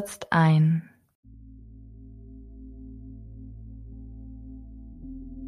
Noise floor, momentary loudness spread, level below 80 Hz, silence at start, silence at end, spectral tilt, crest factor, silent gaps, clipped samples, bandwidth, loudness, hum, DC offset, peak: -47 dBFS; 27 LU; -46 dBFS; 0 s; 0 s; -7 dB/octave; 22 dB; 1.15-1.23 s; under 0.1%; 12.5 kHz; -22 LUFS; none; under 0.1%; -8 dBFS